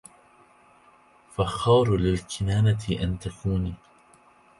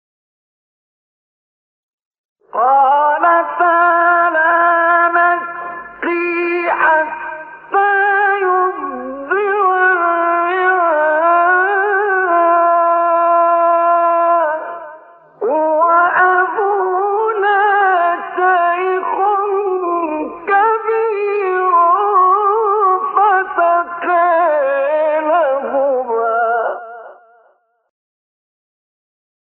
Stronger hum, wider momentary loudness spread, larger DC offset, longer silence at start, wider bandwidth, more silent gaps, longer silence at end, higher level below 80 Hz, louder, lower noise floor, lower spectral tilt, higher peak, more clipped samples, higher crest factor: neither; first, 12 LU vs 8 LU; neither; second, 1.4 s vs 2.55 s; first, 11.5 kHz vs 4.4 kHz; neither; second, 0.85 s vs 2.3 s; first, -42 dBFS vs -66 dBFS; second, -25 LUFS vs -14 LUFS; about the same, -57 dBFS vs -56 dBFS; about the same, -6.5 dB/octave vs -7 dB/octave; second, -8 dBFS vs -2 dBFS; neither; first, 18 dB vs 12 dB